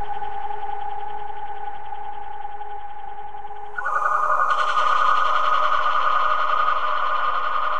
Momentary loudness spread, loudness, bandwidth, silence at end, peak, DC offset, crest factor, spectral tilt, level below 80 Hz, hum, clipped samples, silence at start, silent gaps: 16 LU; -21 LUFS; 9 kHz; 0 s; -6 dBFS; 7%; 16 dB; -2.5 dB/octave; -56 dBFS; none; under 0.1%; 0 s; none